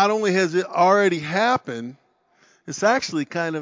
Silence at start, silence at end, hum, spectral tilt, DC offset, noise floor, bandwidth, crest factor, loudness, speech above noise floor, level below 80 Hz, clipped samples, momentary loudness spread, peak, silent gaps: 0 s; 0 s; none; -4.5 dB/octave; under 0.1%; -60 dBFS; 7.6 kHz; 18 dB; -20 LUFS; 39 dB; -66 dBFS; under 0.1%; 16 LU; -4 dBFS; none